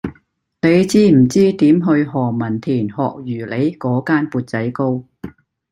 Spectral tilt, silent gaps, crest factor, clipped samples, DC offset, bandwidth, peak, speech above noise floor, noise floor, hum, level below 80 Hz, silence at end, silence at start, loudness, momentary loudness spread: -7 dB/octave; none; 14 dB; under 0.1%; under 0.1%; 12.5 kHz; -2 dBFS; 42 dB; -57 dBFS; none; -52 dBFS; 0.4 s; 0.05 s; -16 LUFS; 14 LU